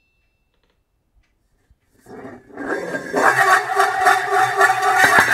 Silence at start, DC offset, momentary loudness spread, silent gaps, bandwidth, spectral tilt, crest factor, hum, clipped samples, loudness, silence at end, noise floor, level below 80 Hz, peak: 2.1 s; under 0.1%; 25 LU; none; 16 kHz; -2.5 dB/octave; 18 dB; none; under 0.1%; -16 LUFS; 0 s; -66 dBFS; -58 dBFS; 0 dBFS